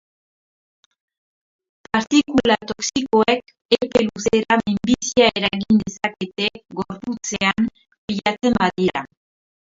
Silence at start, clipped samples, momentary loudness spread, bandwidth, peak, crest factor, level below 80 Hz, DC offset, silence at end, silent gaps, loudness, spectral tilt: 1.95 s; under 0.1%; 11 LU; 7.8 kHz; 0 dBFS; 20 dB; -50 dBFS; under 0.1%; 0.7 s; 3.65-3.69 s, 7.98-8.08 s; -20 LUFS; -4 dB/octave